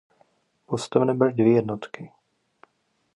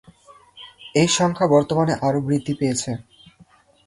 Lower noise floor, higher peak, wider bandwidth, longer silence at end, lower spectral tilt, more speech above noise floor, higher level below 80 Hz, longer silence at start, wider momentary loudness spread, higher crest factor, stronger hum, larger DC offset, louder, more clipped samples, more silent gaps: first, -71 dBFS vs -54 dBFS; about the same, -4 dBFS vs -4 dBFS; about the same, 11.5 kHz vs 11.5 kHz; first, 1.1 s vs 0.85 s; first, -7 dB/octave vs -5 dB/octave; first, 49 dB vs 34 dB; second, -68 dBFS vs -54 dBFS; first, 0.7 s vs 0.55 s; first, 20 LU vs 14 LU; about the same, 22 dB vs 18 dB; neither; neither; second, -23 LUFS vs -20 LUFS; neither; neither